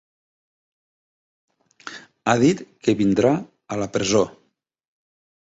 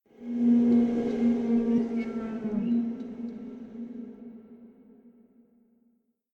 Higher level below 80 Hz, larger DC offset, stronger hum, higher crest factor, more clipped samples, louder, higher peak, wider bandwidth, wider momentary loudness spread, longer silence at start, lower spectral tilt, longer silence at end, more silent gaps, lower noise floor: first, -56 dBFS vs -62 dBFS; neither; neither; first, 20 dB vs 14 dB; neither; first, -21 LUFS vs -27 LUFS; first, -4 dBFS vs -14 dBFS; first, 8 kHz vs 4.4 kHz; about the same, 20 LU vs 19 LU; first, 1.85 s vs 0.2 s; second, -5.5 dB/octave vs -9 dB/octave; about the same, 1.2 s vs 1.25 s; neither; second, -41 dBFS vs -70 dBFS